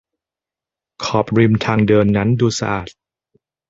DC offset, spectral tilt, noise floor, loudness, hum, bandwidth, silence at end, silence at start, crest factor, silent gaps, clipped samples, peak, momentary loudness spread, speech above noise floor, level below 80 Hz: under 0.1%; -6.5 dB/octave; -88 dBFS; -16 LUFS; none; 7.8 kHz; 0.8 s; 1 s; 16 dB; none; under 0.1%; -2 dBFS; 11 LU; 73 dB; -44 dBFS